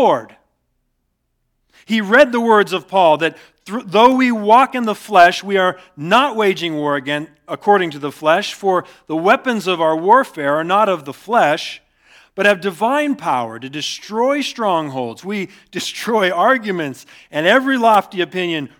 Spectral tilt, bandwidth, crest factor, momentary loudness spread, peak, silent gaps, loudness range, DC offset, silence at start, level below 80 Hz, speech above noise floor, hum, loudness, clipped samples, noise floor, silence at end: -4.5 dB/octave; 18.5 kHz; 16 dB; 13 LU; 0 dBFS; none; 5 LU; under 0.1%; 0 s; -64 dBFS; 53 dB; none; -16 LUFS; under 0.1%; -69 dBFS; 0.1 s